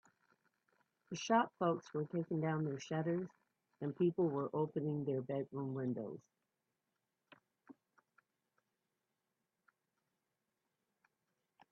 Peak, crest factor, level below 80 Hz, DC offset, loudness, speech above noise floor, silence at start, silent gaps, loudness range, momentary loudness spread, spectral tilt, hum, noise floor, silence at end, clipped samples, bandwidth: -18 dBFS; 24 dB; -86 dBFS; under 0.1%; -39 LUFS; 50 dB; 1.1 s; none; 9 LU; 11 LU; -7 dB/octave; none; -89 dBFS; 4 s; under 0.1%; 7.4 kHz